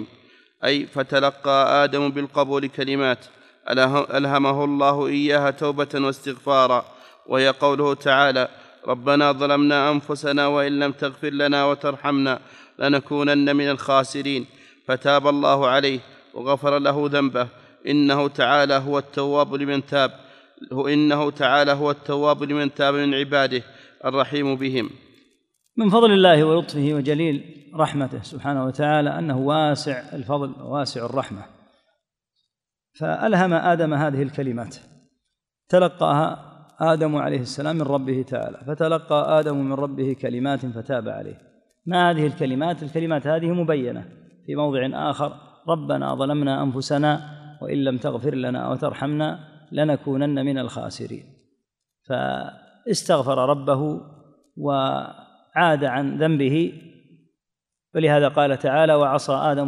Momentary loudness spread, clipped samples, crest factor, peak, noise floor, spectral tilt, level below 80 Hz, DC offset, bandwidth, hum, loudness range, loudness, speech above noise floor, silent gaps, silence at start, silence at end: 11 LU; under 0.1%; 20 dB; -2 dBFS; -86 dBFS; -6 dB/octave; -68 dBFS; under 0.1%; 11.5 kHz; none; 5 LU; -21 LUFS; 66 dB; none; 0 s; 0 s